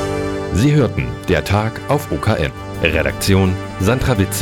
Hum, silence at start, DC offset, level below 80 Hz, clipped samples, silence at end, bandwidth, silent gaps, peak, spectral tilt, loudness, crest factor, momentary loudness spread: none; 0 s; under 0.1%; -32 dBFS; under 0.1%; 0 s; 18 kHz; none; 0 dBFS; -6 dB/octave; -17 LUFS; 16 dB; 6 LU